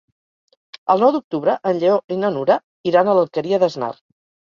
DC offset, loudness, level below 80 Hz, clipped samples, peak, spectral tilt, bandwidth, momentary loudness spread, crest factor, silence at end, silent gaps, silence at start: under 0.1%; -18 LUFS; -66 dBFS; under 0.1%; -2 dBFS; -7 dB/octave; 7.2 kHz; 6 LU; 18 dB; 0.6 s; 1.24-1.31 s, 2.04-2.08 s, 2.63-2.84 s; 0.85 s